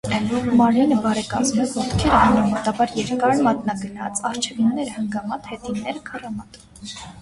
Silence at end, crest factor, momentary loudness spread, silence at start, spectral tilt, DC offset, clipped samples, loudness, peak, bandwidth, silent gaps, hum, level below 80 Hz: 0 s; 18 dB; 15 LU; 0.05 s; -5 dB/octave; under 0.1%; under 0.1%; -20 LUFS; -2 dBFS; 11.5 kHz; none; none; -40 dBFS